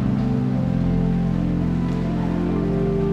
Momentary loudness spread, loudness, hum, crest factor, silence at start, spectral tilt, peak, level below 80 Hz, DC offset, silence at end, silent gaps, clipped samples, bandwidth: 2 LU; -22 LUFS; none; 10 dB; 0 s; -9.5 dB/octave; -10 dBFS; -32 dBFS; under 0.1%; 0 s; none; under 0.1%; 6.6 kHz